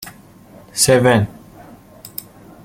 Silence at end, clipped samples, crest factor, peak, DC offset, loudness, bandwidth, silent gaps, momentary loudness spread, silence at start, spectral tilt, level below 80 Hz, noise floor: 0.55 s; under 0.1%; 20 dB; 0 dBFS; under 0.1%; -15 LUFS; 16.5 kHz; none; 20 LU; 0 s; -4 dB/octave; -48 dBFS; -43 dBFS